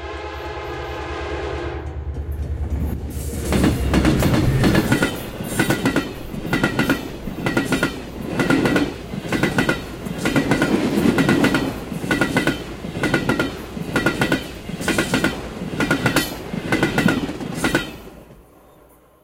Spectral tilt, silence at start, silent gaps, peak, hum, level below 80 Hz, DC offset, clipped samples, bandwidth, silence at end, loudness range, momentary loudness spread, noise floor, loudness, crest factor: -5.5 dB/octave; 0 s; none; -2 dBFS; none; -32 dBFS; under 0.1%; under 0.1%; 17 kHz; 0.8 s; 3 LU; 12 LU; -50 dBFS; -21 LUFS; 18 dB